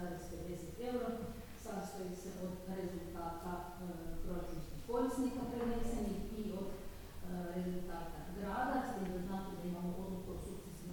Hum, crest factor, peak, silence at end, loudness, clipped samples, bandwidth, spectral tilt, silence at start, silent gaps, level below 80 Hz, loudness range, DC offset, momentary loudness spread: none; 16 dB; -26 dBFS; 0 s; -43 LUFS; under 0.1%; 19 kHz; -6.5 dB/octave; 0 s; none; -52 dBFS; 4 LU; under 0.1%; 9 LU